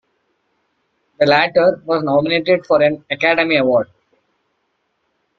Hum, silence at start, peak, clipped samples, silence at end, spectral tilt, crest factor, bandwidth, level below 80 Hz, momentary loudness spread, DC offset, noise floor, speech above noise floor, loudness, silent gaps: none; 1.2 s; 0 dBFS; under 0.1%; 1.55 s; -6.5 dB/octave; 18 dB; 6.4 kHz; -58 dBFS; 5 LU; under 0.1%; -68 dBFS; 53 dB; -15 LUFS; none